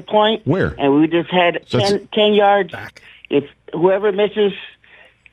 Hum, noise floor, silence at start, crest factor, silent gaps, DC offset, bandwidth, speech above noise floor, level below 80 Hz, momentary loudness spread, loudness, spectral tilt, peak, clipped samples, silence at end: none; -48 dBFS; 0.1 s; 14 dB; none; under 0.1%; 10.5 kHz; 32 dB; -48 dBFS; 10 LU; -16 LUFS; -6 dB/octave; -2 dBFS; under 0.1%; 0.65 s